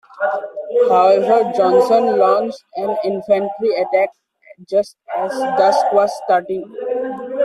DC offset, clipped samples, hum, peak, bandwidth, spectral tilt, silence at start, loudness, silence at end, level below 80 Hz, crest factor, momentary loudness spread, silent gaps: under 0.1%; under 0.1%; none; -2 dBFS; 12.5 kHz; -5.5 dB/octave; 0.15 s; -17 LUFS; 0 s; -64 dBFS; 14 dB; 11 LU; none